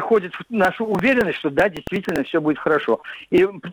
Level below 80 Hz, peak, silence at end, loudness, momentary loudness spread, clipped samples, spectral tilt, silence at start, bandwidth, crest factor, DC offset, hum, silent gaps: -52 dBFS; -4 dBFS; 0 s; -20 LUFS; 6 LU; under 0.1%; -6.5 dB/octave; 0 s; 20 kHz; 16 dB; under 0.1%; none; none